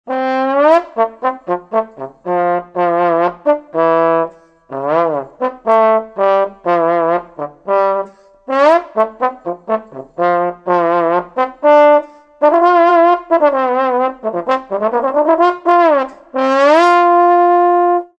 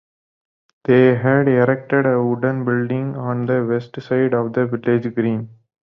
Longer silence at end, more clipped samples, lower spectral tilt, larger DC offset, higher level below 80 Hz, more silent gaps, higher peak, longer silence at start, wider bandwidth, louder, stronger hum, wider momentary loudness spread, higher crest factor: second, 0.15 s vs 0.4 s; neither; second, -6.5 dB/octave vs -10.5 dB/octave; neither; about the same, -60 dBFS vs -60 dBFS; neither; about the same, 0 dBFS vs -2 dBFS; second, 0.05 s vs 0.9 s; first, 8.4 kHz vs 5.8 kHz; first, -13 LUFS vs -18 LUFS; neither; about the same, 11 LU vs 9 LU; about the same, 14 dB vs 16 dB